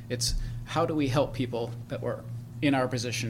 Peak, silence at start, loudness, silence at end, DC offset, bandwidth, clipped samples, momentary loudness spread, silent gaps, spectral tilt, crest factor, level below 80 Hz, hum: -12 dBFS; 0 s; -30 LUFS; 0 s; under 0.1%; 16.5 kHz; under 0.1%; 9 LU; none; -5 dB/octave; 18 dB; -42 dBFS; none